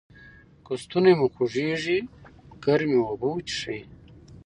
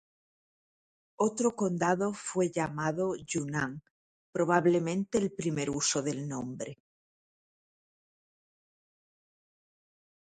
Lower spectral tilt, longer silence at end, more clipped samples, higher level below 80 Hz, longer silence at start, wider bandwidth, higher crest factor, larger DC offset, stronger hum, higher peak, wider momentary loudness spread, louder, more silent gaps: about the same, -6 dB/octave vs -5 dB/octave; second, 0.1 s vs 3.55 s; neither; first, -58 dBFS vs -68 dBFS; second, 0.25 s vs 1.2 s; first, 10.5 kHz vs 9.4 kHz; about the same, 20 dB vs 24 dB; neither; neither; first, -6 dBFS vs -10 dBFS; first, 15 LU vs 10 LU; first, -25 LUFS vs -31 LUFS; second, none vs 3.90-4.33 s